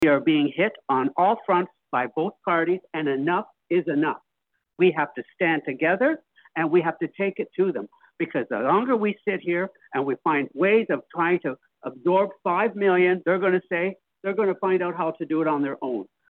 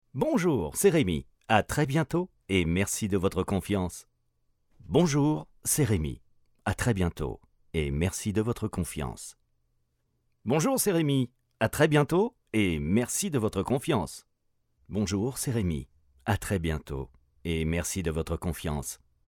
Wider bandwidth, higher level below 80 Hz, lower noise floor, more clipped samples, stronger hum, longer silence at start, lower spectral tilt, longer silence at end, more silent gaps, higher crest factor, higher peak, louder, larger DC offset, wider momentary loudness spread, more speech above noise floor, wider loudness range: second, 4.2 kHz vs 19 kHz; second, -74 dBFS vs -48 dBFS; first, -78 dBFS vs -74 dBFS; neither; neither; second, 0 s vs 0.15 s; first, -8.5 dB/octave vs -5.5 dB/octave; about the same, 0.3 s vs 0.35 s; neither; about the same, 16 dB vs 20 dB; about the same, -8 dBFS vs -8 dBFS; first, -24 LUFS vs -28 LUFS; neither; second, 8 LU vs 12 LU; first, 55 dB vs 47 dB; second, 2 LU vs 5 LU